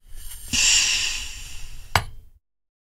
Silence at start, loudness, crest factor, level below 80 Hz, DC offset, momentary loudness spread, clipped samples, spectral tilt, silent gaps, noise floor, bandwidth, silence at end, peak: 0.05 s; -20 LUFS; 24 dB; -38 dBFS; under 0.1%; 25 LU; under 0.1%; 0 dB/octave; none; -51 dBFS; 16 kHz; 0.7 s; 0 dBFS